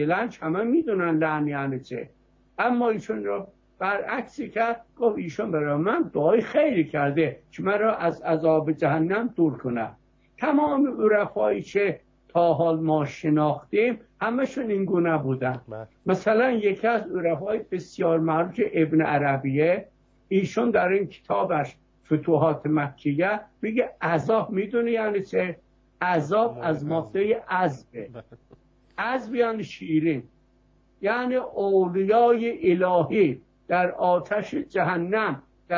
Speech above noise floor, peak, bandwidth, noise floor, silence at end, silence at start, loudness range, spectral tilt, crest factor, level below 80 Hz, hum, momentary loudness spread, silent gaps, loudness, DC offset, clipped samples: 37 dB; -8 dBFS; 7.4 kHz; -61 dBFS; 0 s; 0 s; 4 LU; -8 dB/octave; 16 dB; -62 dBFS; none; 9 LU; none; -24 LUFS; under 0.1%; under 0.1%